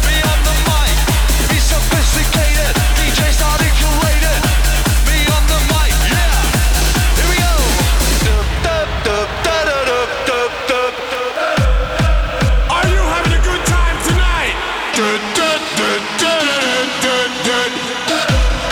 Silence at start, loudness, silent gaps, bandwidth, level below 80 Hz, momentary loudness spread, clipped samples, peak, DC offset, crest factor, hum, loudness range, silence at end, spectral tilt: 0 s; -14 LUFS; none; over 20 kHz; -16 dBFS; 3 LU; under 0.1%; -4 dBFS; under 0.1%; 10 dB; none; 2 LU; 0 s; -3.5 dB/octave